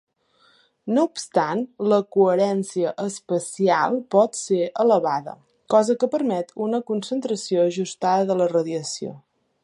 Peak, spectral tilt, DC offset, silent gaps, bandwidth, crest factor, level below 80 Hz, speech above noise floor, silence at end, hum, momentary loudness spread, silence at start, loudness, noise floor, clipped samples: -4 dBFS; -5 dB/octave; under 0.1%; none; 11.5 kHz; 18 dB; -76 dBFS; 39 dB; 0.45 s; none; 8 LU; 0.85 s; -22 LUFS; -60 dBFS; under 0.1%